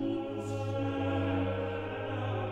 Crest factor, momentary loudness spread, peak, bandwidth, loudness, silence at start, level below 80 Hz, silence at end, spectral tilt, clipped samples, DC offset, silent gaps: 12 dB; 5 LU; -20 dBFS; 9.6 kHz; -34 LUFS; 0 s; -58 dBFS; 0 s; -7.5 dB/octave; under 0.1%; under 0.1%; none